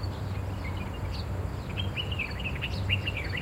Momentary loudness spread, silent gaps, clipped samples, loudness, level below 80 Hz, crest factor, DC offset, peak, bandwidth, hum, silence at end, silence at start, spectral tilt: 6 LU; none; under 0.1%; -32 LUFS; -40 dBFS; 18 dB; under 0.1%; -14 dBFS; 16 kHz; none; 0 s; 0 s; -5.5 dB/octave